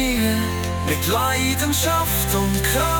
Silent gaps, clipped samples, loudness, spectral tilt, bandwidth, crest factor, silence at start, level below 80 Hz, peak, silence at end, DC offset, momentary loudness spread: none; under 0.1%; -20 LUFS; -4 dB/octave; 19.5 kHz; 14 dB; 0 s; -32 dBFS; -6 dBFS; 0 s; under 0.1%; 4 LU